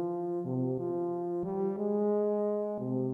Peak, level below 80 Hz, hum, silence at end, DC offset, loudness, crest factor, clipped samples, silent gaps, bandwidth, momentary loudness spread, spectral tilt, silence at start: -20 dBFS; -72 dBFS; none; 0 s; under 0.1%; -32 LUFS; 10 dB; under 0.1%; none; 2.5 kHz; 5 LU; -12 dB/octave; 0 s